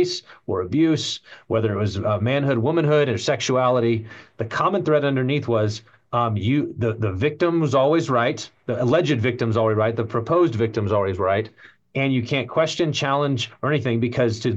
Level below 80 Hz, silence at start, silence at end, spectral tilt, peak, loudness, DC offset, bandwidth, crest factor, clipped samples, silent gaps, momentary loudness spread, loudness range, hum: -60 dBFS; 0 s; 0 s; -6 dB/octave; -6 dBFS; -21 LUFS; under 0.1%; 8.2 kHz; 14 dB; under 0.1%; none; 8 LU; 2 LU; none